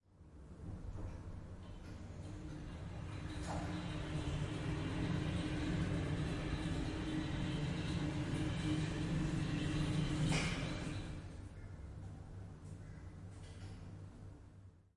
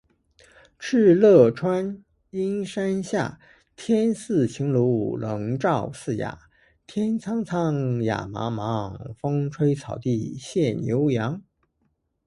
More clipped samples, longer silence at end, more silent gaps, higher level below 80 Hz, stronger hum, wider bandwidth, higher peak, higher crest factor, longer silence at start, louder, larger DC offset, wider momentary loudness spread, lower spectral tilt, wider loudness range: neither; second, 0.15 s vs 0.85 s; neither; first, -50 dBFS vs -56 dBFS; neither; about the same, 11.5 kHz vs 11.5 kHz; second, -24 dBFS vs -4 dBFS; about the same, 16 dB vs 20 dB; second, 0.15 s vs 0.8 s; second, -42 LUFS vs -24 LUFS; neither; about the same, 15 LU vs 13 LU; second, -6 dB/octave vs -7.5 dB/octave; first, 12 LU vs 6 LU